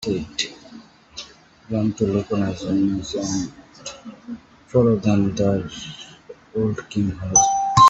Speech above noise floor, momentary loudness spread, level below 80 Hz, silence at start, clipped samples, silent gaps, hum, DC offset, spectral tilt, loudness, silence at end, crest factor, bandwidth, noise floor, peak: 23 dB; 20 LU; -50 dBFS; 0 s; under 0.1%; none; none; under 0.1%; -4.5 dB/octave; -21 LUFS; 0 s; 20 dB; 8 kHz; -45 dBFS; -2 dBFS